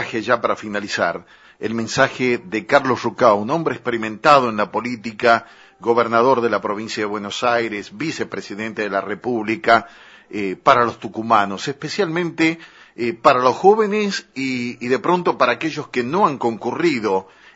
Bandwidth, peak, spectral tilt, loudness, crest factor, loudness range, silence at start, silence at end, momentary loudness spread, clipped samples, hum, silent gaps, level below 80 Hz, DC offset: 8 kHz; 0 dBFS; -5 dB/octave; -19 LUFS; 20 dB; 3 LU; 0 s; 0.3 s; 11 LU; under 0.1%; none; none; -62 dBFS; under 0.1%